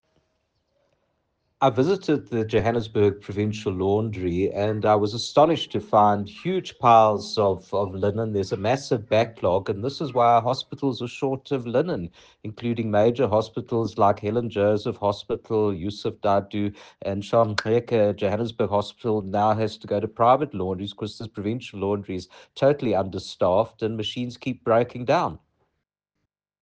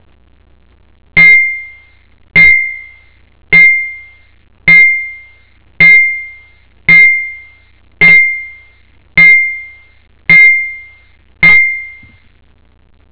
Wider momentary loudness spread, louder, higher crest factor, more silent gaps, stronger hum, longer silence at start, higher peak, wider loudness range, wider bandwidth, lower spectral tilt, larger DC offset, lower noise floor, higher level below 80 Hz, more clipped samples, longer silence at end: second, 10 LU vs 19 LU; second, -24 LUFS vs -5 LUFS; first, 20 dB vs 10 dB; neither; neither; first, 1.6 s vs 1.15 s; second, -4 dBFS vs 0 dBFS; about the same, 4 LU vs 2 LU; first, 9.2 kHz vs 4 kHz; about the same, -6.5 dB/octave vs -5.5 dB/octave; second, under 0.1% vs 0.8%; first, -80 dBFS vs -40 dBFS; second, -56 dBFS vs -42 dBFS; second, under 0.1% vs 2%; about the same, 1.25 s vs 1.2 s